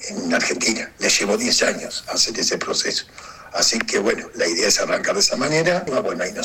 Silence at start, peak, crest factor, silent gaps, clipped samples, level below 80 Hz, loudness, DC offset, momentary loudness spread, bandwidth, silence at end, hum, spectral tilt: 0 s; -2 dBFS; 20 dB; none; under 0.1%; -52 dBFS; -19 LUFS; under 0.1%; 7 LU; 17 kHz; 0 s; none; -1.5 dB/octave